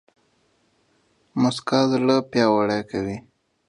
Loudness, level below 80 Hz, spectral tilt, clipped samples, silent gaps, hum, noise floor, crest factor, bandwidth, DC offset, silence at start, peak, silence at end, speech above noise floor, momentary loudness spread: -22 LUFS; -58 dBFS; -6 dB/octave; under 0.1%; none; none; -65 dBFS; 20 dB; 11 kHz; under 0.1%; 1.35 s; -4 dBFS; 0.5 s; 44 dB; 12 LU